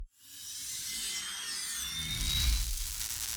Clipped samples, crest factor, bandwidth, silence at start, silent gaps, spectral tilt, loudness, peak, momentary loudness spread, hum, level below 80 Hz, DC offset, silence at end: under 0.1%; 20 dB; over 20 kHz; 0 s; none; -0.5 dB/octave; -33 LUFS; -14 dBFS; 10 LU; none; -40 dBFS; under 0.1%; 0 s